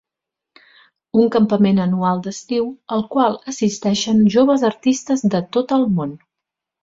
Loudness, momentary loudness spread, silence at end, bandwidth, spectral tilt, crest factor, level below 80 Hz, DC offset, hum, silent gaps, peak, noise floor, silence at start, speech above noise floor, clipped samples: -18 LUFS; 8 LU; 0.65 s; 7.8 kHz; -6 dB/octave; 16 dB; -56 dBFS; under 0.1%; none; none; -2 dBFS; -84 dBFS; 1.15 s; 67 dB; under 0.1%